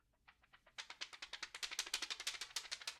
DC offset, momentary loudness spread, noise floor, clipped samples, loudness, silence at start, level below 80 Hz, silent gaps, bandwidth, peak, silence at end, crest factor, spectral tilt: under 0.1%; 11 LU; -72 dBFS; under 0.1%; -45 LUFS; 0.3 s; -78 dBFS; none; 15.5 kHz; -22 dBFS; 0 s; 28 dB; 2.5 dB/octave